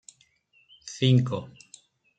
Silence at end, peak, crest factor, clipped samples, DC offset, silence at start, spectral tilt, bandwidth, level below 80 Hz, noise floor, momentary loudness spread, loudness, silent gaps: 0.7 s; -8 dBFS; 22 dB; under 0.1%; under 0.1%; 0.85 s; -6.5 dB/octave; 9 kHz; -66 dBFS; -64 dBFS; 24 LU; -25 LUFS; none